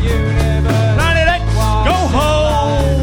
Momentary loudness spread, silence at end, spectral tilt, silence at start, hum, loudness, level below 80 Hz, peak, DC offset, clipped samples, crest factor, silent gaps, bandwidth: 3 LU; 0 s; -6 dB/octave; 0 s; none; -14 LUFS; -18 dBFS; 0 dBFS; under 0.1%; under 0.1%; 12 dB; none; 17.5 kHz